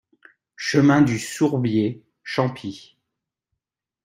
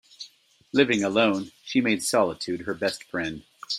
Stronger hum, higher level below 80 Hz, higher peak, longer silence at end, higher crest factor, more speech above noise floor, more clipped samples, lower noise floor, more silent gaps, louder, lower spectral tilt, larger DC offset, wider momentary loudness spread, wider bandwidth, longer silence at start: neither; about the same, -60 dBFS vs -64 dBFS; first, -2 dBFS vs -6 dBFS; first, 1.25 s vs 0 s; about the same, 20 dB vs 20 dB; first, 66 dB vs 30 dB; neither; first, -86 dBFS vs -54 dBFS; neither; first, -21 LUFS vs -25 LUFS; first, -6 dB/octave vs -4 dB/octave; neither; about the same, 18 LU vs 18 LU; about the same, 16 kHz vs 15.5 kHz; first, 0.6 s vs 0.2 s